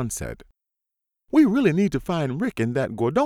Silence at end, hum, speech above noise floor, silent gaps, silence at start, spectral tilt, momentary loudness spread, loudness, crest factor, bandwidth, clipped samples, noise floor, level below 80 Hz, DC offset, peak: 0 s; none; 63 dB; none; 0 s; -6.5 dB/octave; 13 LU; -22 LUFS; 16 dB; 15.5 kHz; under 0.1%; -84 dBFS; -48 dBFS; under 0.1%; -6 dBFS